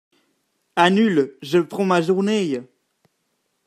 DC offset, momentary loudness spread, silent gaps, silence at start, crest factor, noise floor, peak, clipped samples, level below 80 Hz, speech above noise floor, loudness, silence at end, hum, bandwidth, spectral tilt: under 0.1%; 10 LU; none; 0.75 s; 20 dB; -71 dBFS; 0 dBFS; under 0.1%; -70 dBFS; 53 dB; -20 LUFS; 1.05 s; none; 14.5 kHz; -6 dB/octave